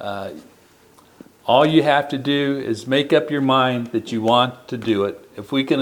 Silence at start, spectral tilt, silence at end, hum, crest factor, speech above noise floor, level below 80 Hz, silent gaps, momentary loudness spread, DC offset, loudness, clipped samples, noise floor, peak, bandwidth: 0 s; -6 dB/octave; 0 s; none; 18 dB; 32 dB; -64 dBFS; none; 13 LU; under 0.1%; -19 LUFS; under 0.1%; -51 dBFS; -2 dBFS; 18.5 kHz